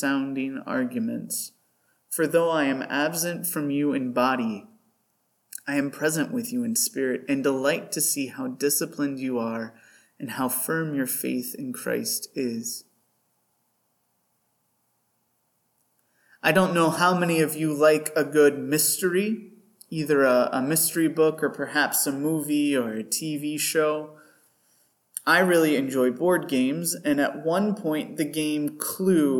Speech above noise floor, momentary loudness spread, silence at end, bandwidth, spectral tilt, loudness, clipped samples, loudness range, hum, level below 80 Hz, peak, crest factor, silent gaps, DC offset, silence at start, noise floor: 48 dB; 10 LU; 0 s; 19 kHz; -4 dB/octave; -24 LUFS; under 0.1%; 6 LU; none; -76 dBFS; -6 dBFS; 20 dB; none; under 0.1%; 0 s; -72 dBFS